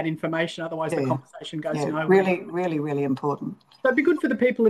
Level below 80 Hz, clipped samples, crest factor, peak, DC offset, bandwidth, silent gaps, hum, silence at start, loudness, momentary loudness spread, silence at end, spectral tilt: -70 dBFS; under 0.1%; 18 dB; -6 dBFS; under 0.1%; 12.5 kHz; none; none; 0 s; -24 LUFS; 10 LU; 0 s; -7 dB/octave